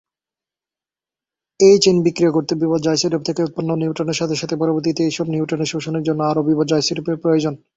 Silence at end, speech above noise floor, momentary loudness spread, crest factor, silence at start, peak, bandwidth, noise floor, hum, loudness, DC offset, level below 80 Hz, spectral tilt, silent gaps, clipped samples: 0.2 s; over 73 dB; 9 LU; 16 dB; 1.6 s; -2 dBFS; 8 kHz; under -90 dBFS; none; -18 LUFS; under 0.1%; -58 dBFS; -5.5 dB/octave; none; under 0.1%